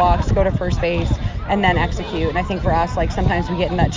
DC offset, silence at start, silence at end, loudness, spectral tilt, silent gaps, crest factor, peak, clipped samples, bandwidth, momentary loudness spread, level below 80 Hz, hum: under 0.1%; 0 s; 0 s; -19 LUFS; -7 dB/octave; none; 16 dB; -2 dBFS; under 0.1%; 7.6 kHz; 5 LU; -24 dBFS; none